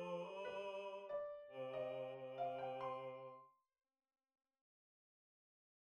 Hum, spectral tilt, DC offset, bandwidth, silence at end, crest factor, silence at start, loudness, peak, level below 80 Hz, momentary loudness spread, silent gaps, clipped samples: none; -6 dB/octave; under 0.1%; 9.8 kHz; 2.4 s; 16 dB; 0 s; -49 LUFS; -34 dBFS; -90 dBFS; 6 LU; none; under 0.1%